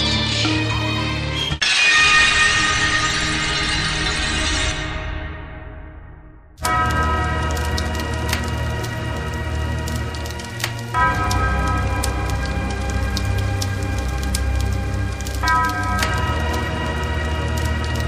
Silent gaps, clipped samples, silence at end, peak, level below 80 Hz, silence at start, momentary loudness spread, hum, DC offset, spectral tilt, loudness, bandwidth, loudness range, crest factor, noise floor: none; under 0.1%; 0 s; -2 dBFS; -26 dBFS; 0 s; 11 LU; none; 0.2%; -3.5 dB/octave; -19 LUFS; 15.5 kHz; 8 LU; 18 dB; -41 dBFS